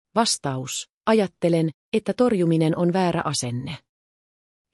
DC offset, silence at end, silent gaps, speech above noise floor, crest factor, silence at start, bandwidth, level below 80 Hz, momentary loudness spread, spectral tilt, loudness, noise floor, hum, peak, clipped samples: under 0.1%; 0.95 s; 0.90-1.01 s, 1.74-1.92 s; over 68 dB; 16 dB; 0.15 s; 13 kHz; -62 dBFS; 9 LU; -5 dB/octave; -23 LUFS; under -90 dBFS; none; -6 dBFS; under 0.1%